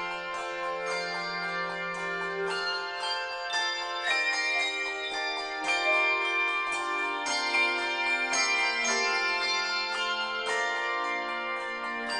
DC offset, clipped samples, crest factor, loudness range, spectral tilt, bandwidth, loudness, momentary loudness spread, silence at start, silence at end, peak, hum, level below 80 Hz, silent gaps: under 0.1%; under 0.1%; 16 dB; 5 LU; -0.5 dB/octave; 11 kHz; -28 LUFS; 7 LU; 0 s; 0 s; -14 dBFS; none; -66 dBFS; none